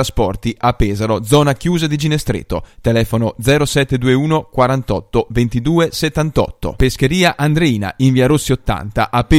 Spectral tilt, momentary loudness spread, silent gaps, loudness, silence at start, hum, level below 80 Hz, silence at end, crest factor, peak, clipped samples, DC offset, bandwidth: -6 dB/octave; 5 LU; none; -15 LUFS; 0 s; none; -28 dBFS; 0 s; 14 dB; 0 dBFS; under 0.1%; under 0.1%; 16 kHz